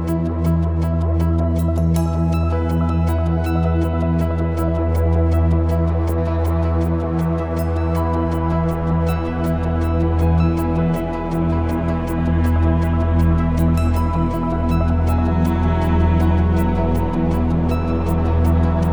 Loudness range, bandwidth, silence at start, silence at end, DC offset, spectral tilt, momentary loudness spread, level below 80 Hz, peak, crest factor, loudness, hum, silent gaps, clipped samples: 2 LU; over 20 kHz; 0 s; 0 s; 0.8%; -9 dB/octave; 4 LU; -26 dBFS; -4 dBFS; 12 dB; -19 LUFS; none; none; under 0.1%